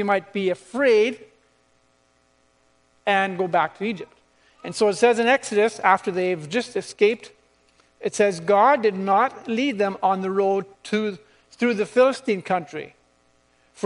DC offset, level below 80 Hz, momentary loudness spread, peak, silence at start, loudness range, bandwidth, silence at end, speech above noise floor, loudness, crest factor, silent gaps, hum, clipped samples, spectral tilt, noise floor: under 0.1%; -70 dBFS; 13 LU; -2 dBFS; 0 s; 4 LU; 10.5 kHz; 0 s; 42 dB; -22 LUFS; 20 dB; none; none; under 0.1%; -4.5 dB/octave; -63 dBFS